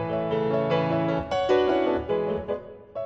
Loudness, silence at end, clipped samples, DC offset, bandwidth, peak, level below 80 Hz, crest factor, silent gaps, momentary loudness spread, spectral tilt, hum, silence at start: -25 LUFS; 0 s; under 0.1%; under 0.1%; 7.8 kHz; -10 dBFS; -50 dBFS; 16 dB; none; 10 LU; -7.5 dB/octave; none; 0 s